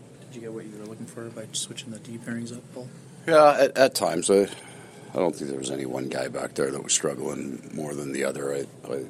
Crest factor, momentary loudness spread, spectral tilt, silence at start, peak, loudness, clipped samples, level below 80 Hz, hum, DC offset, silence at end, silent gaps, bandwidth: 22 dB; 20 LU; -3.5 dB/octave; 0 s; -4 dBFS; -25 LUFS; under 0.1%; -68 dBFS; none; under 0.1%; 0 s; none; 15 kHz